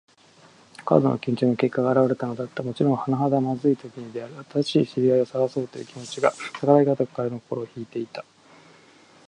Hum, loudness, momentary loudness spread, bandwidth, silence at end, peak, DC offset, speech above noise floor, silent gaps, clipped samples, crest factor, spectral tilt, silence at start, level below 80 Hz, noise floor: none; -23 LUFS; 15 LU; 10.5 kHz; 1.05 s; -2 dBFS; under 0.1%; 31 dB; none; under 0.1%; 22 dB; -7.5 dB/octave; 0.8 s; -68 dBFS; -54 dBFS